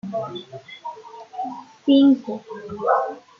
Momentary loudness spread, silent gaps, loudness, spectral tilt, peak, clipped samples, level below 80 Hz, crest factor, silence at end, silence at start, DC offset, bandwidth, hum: 21 LU; none; -21 LUFS; -7 dB/octave; -6 dBFS; under 0.1%; -68 dBFS; 16 dB; 0.2 s; 0.05 s; under 0.1%; 6.6 kHz; none